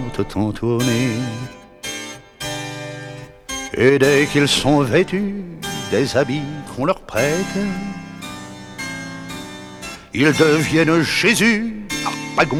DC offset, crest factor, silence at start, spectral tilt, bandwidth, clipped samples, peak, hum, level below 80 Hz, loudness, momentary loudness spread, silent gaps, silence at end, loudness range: under 0.1%; 16 dB; 0 s; -4.5 dB/octave; 17.5 kHz; under 0.1%; -2 dBFS; none; -44 dBFS; -18 LUFS; 18 LU; none; 0 s; 7 LU